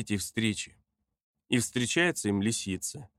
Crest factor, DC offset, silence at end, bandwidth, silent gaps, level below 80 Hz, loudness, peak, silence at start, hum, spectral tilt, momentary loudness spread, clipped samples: 20 dB; under 0.1%; 0.15 s; 15.5 kHz; 1.23-1.34 s; -64 dBFS; -29 LUFS; -10 dBFS; 0 s; none; -3.5 dB/octave; 9 LU; under 0.1%